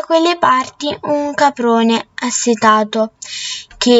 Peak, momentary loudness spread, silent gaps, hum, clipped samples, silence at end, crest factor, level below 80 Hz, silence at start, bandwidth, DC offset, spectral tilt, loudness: 0 dBFS; 10 LU; none; none; under 0.1%; 0 s; 14 dB; -54 dBFS; 0 s; 8 kHz; under 0.1%; -3 dB/octave; -15 LUFS